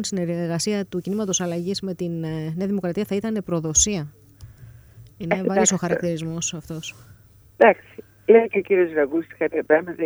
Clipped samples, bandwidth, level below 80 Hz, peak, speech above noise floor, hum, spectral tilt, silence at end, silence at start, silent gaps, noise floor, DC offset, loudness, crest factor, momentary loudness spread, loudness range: under 0.1%; over 20 kHz; -50 dBFS; -2 dBFS; 25 dB; none; -4 dB/octave; 0 s; 0 s; none; -46 dBFS; under 0.1%; -22 LUFS; 22 dB; 12 LU; 4 LU